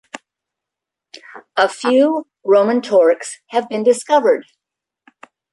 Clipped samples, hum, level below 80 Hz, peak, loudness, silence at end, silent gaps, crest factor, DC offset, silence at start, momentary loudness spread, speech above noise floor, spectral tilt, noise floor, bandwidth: under 0.1%; none; -70 dBFS; -2 dBFS; -16 LUFS; 1.1 s; none; 16 dB; under 0.1%; 0.15 s; 10 LU; 69 dB; -4 dB/octave; -84 dBFS; 11.5 kHz